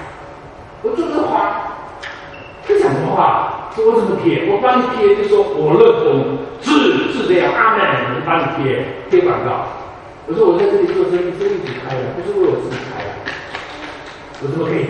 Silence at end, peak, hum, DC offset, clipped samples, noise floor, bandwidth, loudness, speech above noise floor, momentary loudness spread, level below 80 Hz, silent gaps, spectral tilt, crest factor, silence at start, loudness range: 0 s; 0 dBFS; none; under 0.1%; under 0.1%; -35 dBFS; 9.8 kHz; -15 LUFS; 21 dB; 17 LU; -48 dBFS; none; -6.5 dB/octave; 16 dB; 0 s; 6 LU